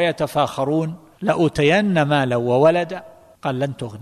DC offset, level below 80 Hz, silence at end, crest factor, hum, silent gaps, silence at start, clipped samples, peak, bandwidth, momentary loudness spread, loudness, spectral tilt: under 0.1%; -50 dBFS; 0 s; 16 dB; none; none; 0 s; under 0.1%; -4 dBFS; 13.5 kHz; 12 LU; -19 LUFS; -6.5 dB/octave